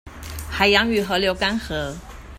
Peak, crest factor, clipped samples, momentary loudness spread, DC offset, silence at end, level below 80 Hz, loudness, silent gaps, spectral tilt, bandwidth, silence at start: -2 dBFS; 22 dB; under 0.1%; 18 LU; under 0.1%; 0 s; -38 dBFS; -20 LUFS; none; -4 dB/octave; 16 kHz; 0.05 s